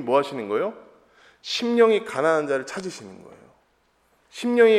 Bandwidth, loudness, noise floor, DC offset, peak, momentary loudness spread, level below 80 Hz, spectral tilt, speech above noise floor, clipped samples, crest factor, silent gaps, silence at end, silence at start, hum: 12 kHz; -23 LUFS; -65 dBFS; under 0.1%; -4 dBFS; 21 LU; -72 dBFS; -4.5 dB/octave; 43 dB; under 0.1%; 18 dB; none; 0 s; 0 s; none